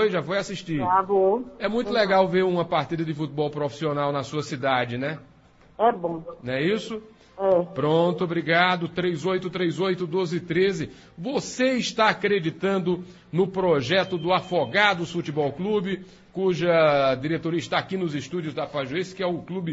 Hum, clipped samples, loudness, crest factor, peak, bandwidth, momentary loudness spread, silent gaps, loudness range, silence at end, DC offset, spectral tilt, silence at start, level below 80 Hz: none; under 0.1%; -24 LUFS; 20 dB; -4 dBFS; 8 kHz; 10 LU; none; 3 LU; 0 s; under 0.1%; -5.5 dB/octave; 0 s; -58 dBFS